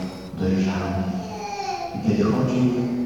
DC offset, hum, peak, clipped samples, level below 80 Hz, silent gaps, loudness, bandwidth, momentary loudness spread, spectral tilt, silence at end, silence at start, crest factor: 0.2%; none; -8 dBFS; under 0.1%; -48 dBFS; none; -24 LUFS; 16 kHz; 9 LU; -7 dB/octave; 0 s; 0 s; 16 dB